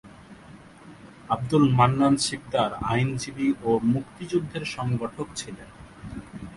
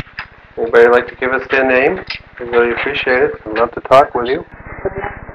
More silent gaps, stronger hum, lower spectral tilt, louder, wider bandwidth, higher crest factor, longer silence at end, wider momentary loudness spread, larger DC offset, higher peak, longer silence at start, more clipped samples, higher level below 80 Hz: neither; neither; about the same, -6 dB/octave vs -6 dB/octave; second, -25 LUFS vs -14 LUFS; first, 11.5 kHz vs 8.4 kHz; first, 20 dB vs 14 dB; about the same, 0 s vs 0 s; first, 20 LU vs 15 LU; neither; second, -6 dBFS vs 0 dBFS; about the same, 0.05 s vs 0.15 s; second, under 0.1% vs 0.3%; second, -52 dBFS vs -40 dBFS